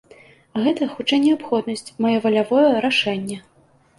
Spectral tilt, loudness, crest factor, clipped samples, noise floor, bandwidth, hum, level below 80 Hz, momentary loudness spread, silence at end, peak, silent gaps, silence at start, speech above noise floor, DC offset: -5 dB/octave; -19 LUFS; 16 dB; under 0.1%; -49 dBFS; 11.5 kHz; none; -64 dBFS; 13 LU; 0.6 s; -4 dBFS; none; 0.55 s; 30 dB; under 0.1%